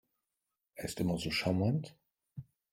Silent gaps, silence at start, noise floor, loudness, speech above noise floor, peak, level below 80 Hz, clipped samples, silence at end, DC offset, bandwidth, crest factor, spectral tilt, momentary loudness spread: none; 0.75 s; -88 dBFS; -34 LUFS; 55 dB; -18 dBFS; -62 dBFS; under 0.1%; 0.3 s; under 0.1%; 16.5 kHz; 20 dB; -5.5 dB/octave; 20 LU